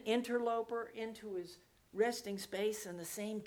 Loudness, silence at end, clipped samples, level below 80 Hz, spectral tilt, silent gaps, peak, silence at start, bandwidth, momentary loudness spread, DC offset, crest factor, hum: -39 LUFS; 0 s; under 0.1%; -76 dBFS; -4 dB/octave; none; -22 dBFS; 0 s; over 20 kHz; 10 LU; under 0.1%; 18 dB; none